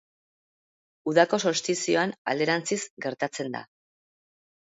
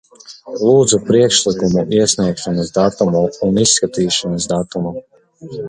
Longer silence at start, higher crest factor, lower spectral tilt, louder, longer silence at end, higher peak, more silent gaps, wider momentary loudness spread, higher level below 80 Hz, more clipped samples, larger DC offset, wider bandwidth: first, 1.05 s vs 0.3 s; first, 24 dB vs 16 dB; about the same, -3.5 dB/octave vs -4 dB/octave; second, -26 LUFS vs -15 LUFS; first, 1.05 s vs 0 s; second, -4 dBFS vs 0 dBFS; first, 2.18-2.25 s, 2.90-2.97 s vs none; about the same, 12 LU vs 11 LU; second, -76 dBFS vs -46 dBFS; neither; neither; second, 8 kHz vs 11.5 kHz